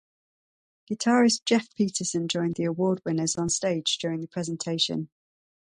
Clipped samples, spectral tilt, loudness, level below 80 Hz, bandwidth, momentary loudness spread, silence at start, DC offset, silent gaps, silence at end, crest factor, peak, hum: under 0.1%; -4 dB/octave; -26 LUFS; -64 dBFS; 11 kHz; 10 LU; 0.9 s; under 0.1%; none; 0.7 s; 18 dB; -8 dBFS; none